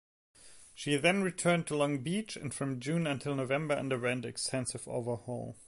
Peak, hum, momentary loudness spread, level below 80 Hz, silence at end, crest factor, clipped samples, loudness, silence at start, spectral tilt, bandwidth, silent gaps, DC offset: -12 dBFS; none; 9 LU; -68 dBFS; 0 s; 22 dB; under 0.1%; -33 LUFS; 0.4 s; -4.5 dB/octave; 11.5 kHz; none; under 0.1%